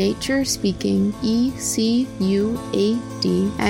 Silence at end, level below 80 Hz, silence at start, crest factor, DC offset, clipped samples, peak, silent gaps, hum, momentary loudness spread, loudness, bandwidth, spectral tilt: 0 s; -44 dBFS; 0 s; 14 dB; under 0.1%; under 0.1%; -6 dBFS; none; none; 2 LU; -21 LUFS; 16.5 kHz; -5 dB/octave